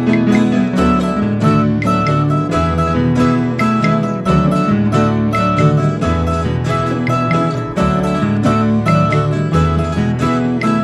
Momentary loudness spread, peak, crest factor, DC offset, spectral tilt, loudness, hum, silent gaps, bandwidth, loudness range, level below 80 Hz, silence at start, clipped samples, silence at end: 3 LU; 0 dBFS; 12 dB; under 0.1%; -7.5 dB/octave; -14 LUFS; none; none; 11.5 kHz; 1 LU; -30 dBFS; 0 s; under 0.1%; 0 s